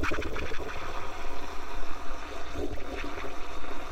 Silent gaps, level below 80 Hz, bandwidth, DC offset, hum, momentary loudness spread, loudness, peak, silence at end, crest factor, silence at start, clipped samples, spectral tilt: none; -38 dBFS; 8.4 kHz; under 0.1%; none; 5 LU; -38 LUFS; -14 dBFS; 0 s; 10 dB; 0 s; under 0.1%; -4.5 dB/octave